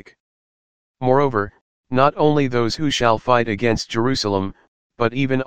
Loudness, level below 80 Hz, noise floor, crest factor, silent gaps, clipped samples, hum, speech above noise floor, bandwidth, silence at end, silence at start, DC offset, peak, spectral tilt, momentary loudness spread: -19 LUFS; -46 dBFS; under -90 dBFS; 18 dB; 0.20-0.94 s, 1.61-1.84 s, 4.68-4.90 s; under 0.1%; none; over 72 dB; 15.5 kHz; 0 s; 0 s; 2%; 0 dBFS; -5.5 dB/octave; 8 LU